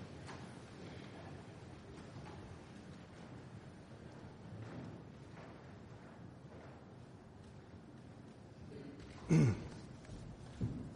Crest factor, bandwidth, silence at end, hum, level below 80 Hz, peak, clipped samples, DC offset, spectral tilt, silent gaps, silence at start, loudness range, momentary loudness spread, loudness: 24 dB; 10.5 kHz; 0 s; none; -62 dBFS; -20 dBFS; under 0.1%; under 0.1%; -7.5 dB/octave; none; 0 s; 15 LU; 12 LU; -45 LUFS